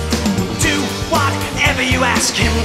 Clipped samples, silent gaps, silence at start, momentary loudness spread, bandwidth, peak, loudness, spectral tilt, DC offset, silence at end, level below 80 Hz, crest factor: under 0.1%; none; 0 s; 4 LU; 16 kHz; 0 dBFS; -15 LUFS; -3.5 dB/octave; under 0.1%; 0 s; -28 dBFS; 16 dB